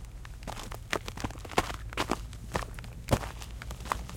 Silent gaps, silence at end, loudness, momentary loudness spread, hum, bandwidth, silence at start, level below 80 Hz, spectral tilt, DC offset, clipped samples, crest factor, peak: none; 0 s; -36 LUFS; 10 LU; none; 17 kHz; 0 s; -42 dBFS; -4.5 dB/octave; under 0.1%; under 0.1%; 28 dB; -8 dBFS